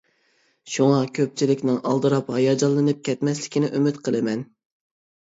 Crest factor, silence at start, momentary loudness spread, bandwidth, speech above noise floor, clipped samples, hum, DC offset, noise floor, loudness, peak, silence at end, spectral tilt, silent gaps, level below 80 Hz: 16 dB; 0.65 s; 5 LU; 8 kHz; 44 dB; under 0.1%; none; under 0.1%; -65 dBFS; -22 LUFS; -6 dBFS; 0.8 s; -6 dB/octave; none; -70 dBFS